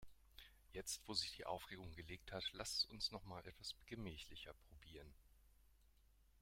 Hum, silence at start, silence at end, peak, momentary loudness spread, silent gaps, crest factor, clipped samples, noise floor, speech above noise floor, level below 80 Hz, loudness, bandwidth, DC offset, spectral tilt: none; 0 s; 0 s; -28 dBFS; 21 LU; none; 24 dB; under 0.1%; -73 dBFS; 23 dB; -68 dBFS; -48 LUFS; 16.5 kHz; under 0.1%; -2.5 dB/octave